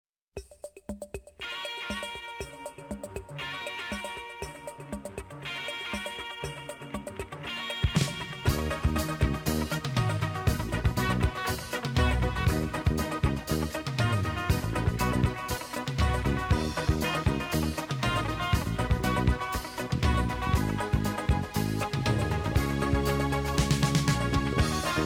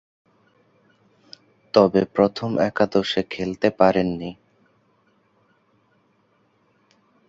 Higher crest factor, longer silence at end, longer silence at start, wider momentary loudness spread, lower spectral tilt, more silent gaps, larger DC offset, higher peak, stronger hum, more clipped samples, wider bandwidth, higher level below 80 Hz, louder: second, 16 dB vs 22 dB; second, 0 s vs 2.95 s; second, 0.35 s vs 1.75 s; about the same, 12 LU vs 10 LU; about the same, -5.5 dB/octave vs -6.5 dB/octave; neither; neither; second, -14 dBFS vs -2 dBFS; neither; neither; first, 19 kHz vs 7.8 kHz; first, -36 dBFS vs -56 dBFS; second, -30 LUFS vs -21 LUFS